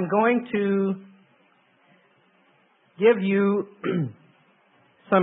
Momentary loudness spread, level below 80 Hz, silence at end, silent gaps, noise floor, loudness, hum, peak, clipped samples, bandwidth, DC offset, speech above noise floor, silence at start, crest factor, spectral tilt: 8 LU; -74 dBFS; 0 s; none; -62 dBFS; -23 LUFS; none; -6 dBFS; under 0.1%; 3.9 kHz; under 0.1%; 40 dB; 0 s; 18 dB; -11.5 dB/octave